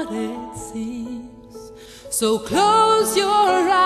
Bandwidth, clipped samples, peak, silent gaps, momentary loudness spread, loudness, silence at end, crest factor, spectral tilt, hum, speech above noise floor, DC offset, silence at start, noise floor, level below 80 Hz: 13 kHz; under 0.1%; -4 dBFS; none; 25 LU; -18 LUFS; 0 s; 16 dB; -3 dB/octave; none; 21 dB; under 0.1%; 0 s; -40 dBFS; -52 dBFS